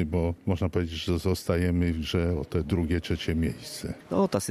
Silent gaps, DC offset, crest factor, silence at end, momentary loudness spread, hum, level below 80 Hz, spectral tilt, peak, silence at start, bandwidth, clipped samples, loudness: none; under 0.1%; 16 dB; 0 s; 4 LU; none; -40 dBFS; -6 dB/octave; -12 dBFS; 0 s; 14.5 kHz; under 0.1%; -28 LUFS